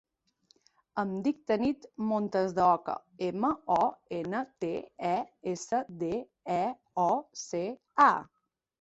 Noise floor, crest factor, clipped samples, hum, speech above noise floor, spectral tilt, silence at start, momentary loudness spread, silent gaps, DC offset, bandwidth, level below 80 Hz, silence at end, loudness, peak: -69 dBFS; 22 dB; under 0.1%; none; 39 dB; -5.5 dB/octave; 0.95 s; 10 LU; none; under 0.1%; 8.2 kHz; -68 dBFS; 0.6 s; -31 LUFS; -10 dBFS